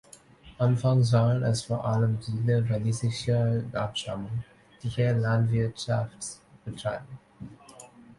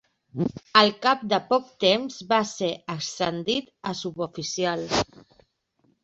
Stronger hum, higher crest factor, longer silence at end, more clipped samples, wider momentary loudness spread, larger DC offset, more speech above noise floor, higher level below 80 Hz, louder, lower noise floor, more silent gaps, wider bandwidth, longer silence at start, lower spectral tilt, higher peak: neither; second, 16 dB vs 24 dB; second, 0.05 s vs 1 s; neither; first, 19 LU vs 12 LU; neither; second, 26 dB vs 43 dB; about the same, -54 dBFS vs -58 dBFS; about the same, -27 LUFS vs -25 LUFS; second, -52 dBFS vs -68 dBFS; neither; first, 11.5 kHz vs 8.2 kHz; about the same, 0.45 s vs 0.35 s; first, -6.5 dB/octave vs -3.5 dB/octave; second, -10 dBFS vs -2 dBFS